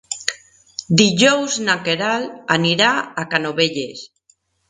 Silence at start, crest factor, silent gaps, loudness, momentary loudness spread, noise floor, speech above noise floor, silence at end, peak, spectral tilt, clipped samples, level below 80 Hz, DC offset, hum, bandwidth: 0.1 s; 20 dB; none; -17 LUFS; 14 LU; -60 dBFS; 42 dB; 0.65 s; 0 dBFS; -3.5 dB/octave; under 0.1%; -58 dBFS; under 0.1%; none; 11.5 kHz